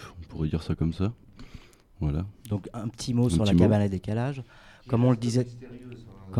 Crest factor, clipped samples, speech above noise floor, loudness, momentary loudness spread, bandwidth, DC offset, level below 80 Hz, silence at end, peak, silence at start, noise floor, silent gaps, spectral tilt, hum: 20 dB; under 0.1%; 23 dB; -27 LUFS; 22 LU; 13.5 kHz; under 0.1%; -44 dBFS; 0 s; -8 dBFS; 0 s; -49 dBFS; none; -7.5 dB/octave; none